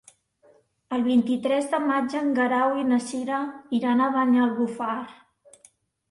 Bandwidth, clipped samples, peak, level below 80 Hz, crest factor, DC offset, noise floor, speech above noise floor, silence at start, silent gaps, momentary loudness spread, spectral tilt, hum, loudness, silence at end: 11.5 kHz; under 0.1%; -12 dBFS; -70 dBFS; 14 dB; under 0.1%; -60 dBFS; 37 dB; 0.9 s; none; 8 LU; -5 dB/octave; none; -24 LUFS; 1 s